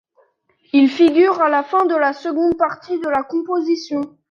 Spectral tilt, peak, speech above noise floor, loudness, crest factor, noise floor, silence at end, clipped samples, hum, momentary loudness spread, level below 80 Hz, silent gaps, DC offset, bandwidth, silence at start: -5 dB/octave; -2 dBFS; 44 dB; -17 LUFS; 14 dB; -60 dBFS; 0.2 s; under 0.1%; none; 8 LU; -58 dBFS; none; under 0.1%; 7 kHz; 0.75 s